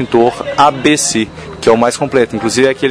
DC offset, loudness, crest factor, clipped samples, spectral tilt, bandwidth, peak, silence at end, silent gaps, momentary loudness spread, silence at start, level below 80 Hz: under 0.1%; -12 LUFS; 12 dB; 0.3%; -3.5 dB/octave; 11 kHz; 0 dBFS; 0 s; none; 5 LU; 0 s; -44 dBFS